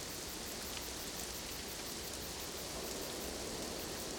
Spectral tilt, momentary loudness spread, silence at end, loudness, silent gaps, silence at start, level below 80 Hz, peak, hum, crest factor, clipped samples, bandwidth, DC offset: -2 dB/octave; 1 LU; 0 s; -42 LUFS; none; 0 s; -56 dBFS; -28 dBFS; none; 16 dB; under 0.1%; over 20 kHz; under 0.1%